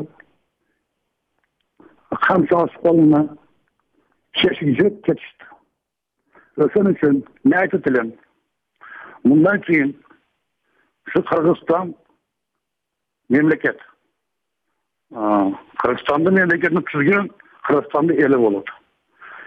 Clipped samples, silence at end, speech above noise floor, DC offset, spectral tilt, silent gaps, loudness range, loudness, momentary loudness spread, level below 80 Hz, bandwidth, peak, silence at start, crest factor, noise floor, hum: under 0.1%; 0.05 s; 63 dB; under 0.1%; -8.5 dB/octave; none; 5 LU; -18 LUFS; 15 LU; -60 dBFS; 4.9 kHz; -4 dBFS; 0 s; 16 dB; -80 dBFS; none